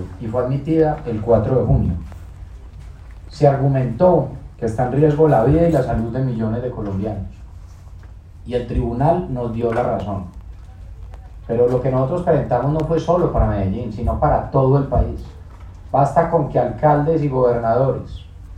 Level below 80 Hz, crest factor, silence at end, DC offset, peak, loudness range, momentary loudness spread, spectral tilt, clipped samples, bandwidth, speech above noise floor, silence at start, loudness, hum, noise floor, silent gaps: -32 dBFS; 18 dB; 0 s; under 0.1%; 0 dBFS; 6 LU; 22 LU; -9.5 dB/octave; under 0.1%; 9 kHz; 21 dB; 0 s; -18 LUFS; none; -38 dBFS; none